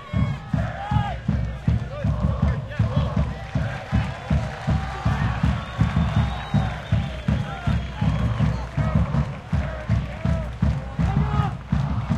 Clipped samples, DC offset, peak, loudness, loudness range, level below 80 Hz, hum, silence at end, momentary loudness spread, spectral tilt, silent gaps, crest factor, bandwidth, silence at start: under 0.1%; under 0.1%; -8 dBFS; -25 LUFS; 1 LU; -30 dBFS; none; 0 s; 4 LU; -8 dB/octave; none; 16 dB; 9.2 kHz; 0 s